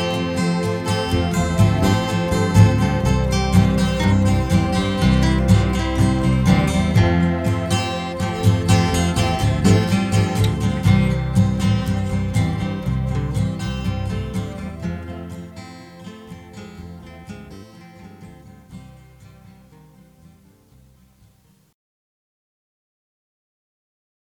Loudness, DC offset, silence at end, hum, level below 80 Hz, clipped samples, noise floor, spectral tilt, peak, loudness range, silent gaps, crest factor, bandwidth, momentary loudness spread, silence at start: -19 LUFS; under 0.1%; 5.1 s; none; -30 dBFS; under 0.1%; -56 dBFS; -6.5 dB/octave; 0 dBFS; 20 LU; none; 20 dB; 16.5 kHz; 21 LU; 0 s